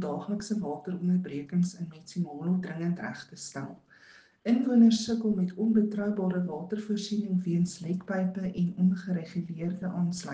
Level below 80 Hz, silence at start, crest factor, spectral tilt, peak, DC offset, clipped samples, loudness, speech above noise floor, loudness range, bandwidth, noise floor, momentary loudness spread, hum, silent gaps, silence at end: -68 dBFS; 0 s; 18 dB; -7 dB/octave; -12 dBFS; under 0.1%; under 0.1%; -30 LUFS; 28 dB; 6 LU; 9.4 kHz; -57 dBFS; 11 LU; none; none; 0 s